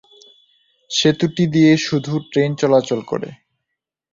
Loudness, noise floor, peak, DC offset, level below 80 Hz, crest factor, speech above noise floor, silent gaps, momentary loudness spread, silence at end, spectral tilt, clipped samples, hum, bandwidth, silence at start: -17 LUFS; -80 dBFS; -2 dBFS; under 0.1%; -56 dBFS; 16 dB; 64 dB; none; 11 LU; 0.8 s; -5.5 dB/octave; under 0.1%; none; 7.6 kHz; 0.9 s